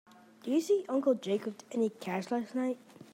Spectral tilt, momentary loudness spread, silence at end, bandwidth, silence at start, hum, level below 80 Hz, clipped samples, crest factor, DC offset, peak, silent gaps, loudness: -6 dB/octave; 8 LU; 0.1 s; 16 kHz; 0.45 s; none; -88 dBFS; under 0.1%; 16 dB; under 0.1%; -18 dBFS; none; -33 LUFS